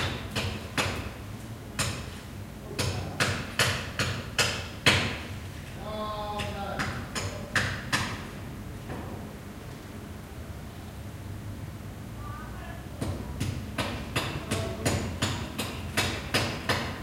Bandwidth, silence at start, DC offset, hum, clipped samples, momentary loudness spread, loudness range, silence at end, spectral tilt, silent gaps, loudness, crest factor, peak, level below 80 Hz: 16.5 kHz; 0 s; under 0.1%; none; under 0.1%; 14 LU; 13 LU; 0 s; -3.5 dB/octave; none; -31 LUFS; 26 dB; -6 dBFS; -46 dBFS